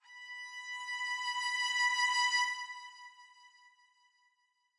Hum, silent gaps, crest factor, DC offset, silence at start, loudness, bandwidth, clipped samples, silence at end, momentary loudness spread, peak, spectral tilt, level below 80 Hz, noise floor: none; none; 16 dB; under 0.1%; 0.1 s; -33 LUFS; 11.5 kHz; under 0.1%; 1.3 s; 18 LU; -20 dBFS; 11 dB/octave; under -90 dBFS; -77 dBFS